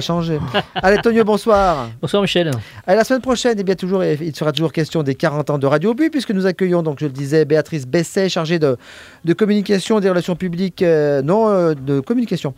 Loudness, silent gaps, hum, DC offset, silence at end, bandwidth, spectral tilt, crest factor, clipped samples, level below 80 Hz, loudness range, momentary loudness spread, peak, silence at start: -17 LUFS; none; none; under 0.1%; 0.05 s; 16 kHz; -6 dB/octave; 16 dB; under 0.1%; -44 dBFS; 2 LU; 6 LU; 0 dBFS; 0 s